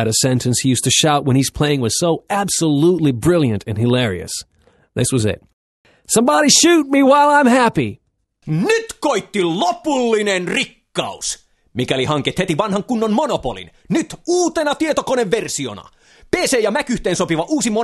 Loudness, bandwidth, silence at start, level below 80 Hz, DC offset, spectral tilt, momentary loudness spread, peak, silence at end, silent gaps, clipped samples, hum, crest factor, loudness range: -16 LUFS; 13 kHz; 0 s; -46 dBFS; under 0.1%; -4 dB/octave; 12 LU; 0 dBFS; 0 s; 5.53-5.84 s; under 0.1%; none; 16 dB; 6 LU